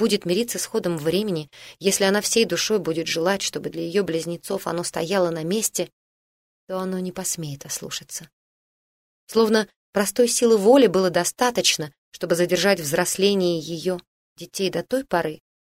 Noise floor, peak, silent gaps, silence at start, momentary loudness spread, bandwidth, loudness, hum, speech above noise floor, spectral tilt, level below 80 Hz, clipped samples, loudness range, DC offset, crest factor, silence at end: under -90 dBFS; -4 dBFS; 5.93-6.67 s, 8.33-9.27 s, 9.76-9.93 s, 11.98-12.12 s, 14.07-14.36 s; 0 s; 12 LU; 16 kHz; -22 LUFS; none; over 68 dB; -3.5 dB/octave; -62 dBFS; under 0.1%; 8 LU; under 0.1%; 18 dB; 0.35 s